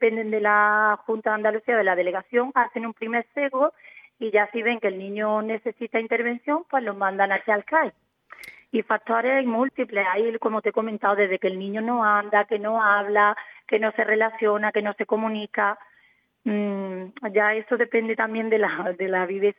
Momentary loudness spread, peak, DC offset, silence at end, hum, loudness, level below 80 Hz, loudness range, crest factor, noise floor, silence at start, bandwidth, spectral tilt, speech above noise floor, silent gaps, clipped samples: 8 LU; -6 dBFS; under 0.1%; 0.05 s; none; -23 LUFS; -84 dBFS; 3 LU; 18 dB; -62 dBFS; 0 s; 5.2 kHz; -7.5 dB/octave; 38 dB; none; under 0.1%